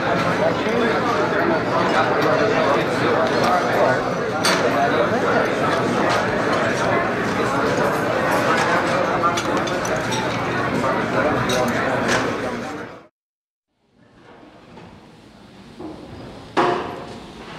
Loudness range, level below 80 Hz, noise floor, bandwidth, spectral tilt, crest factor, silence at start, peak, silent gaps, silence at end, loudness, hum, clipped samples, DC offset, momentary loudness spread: 10 LU; -48 dBFS; -58 dBFS; 16 kHz; -4.5 dB/octave; 16 dB; 0 s; -4 dBFS; 13.11-13.63 s; 0 s; -19 LUFS; none; under 0.1%; under 0.1%; 10 LU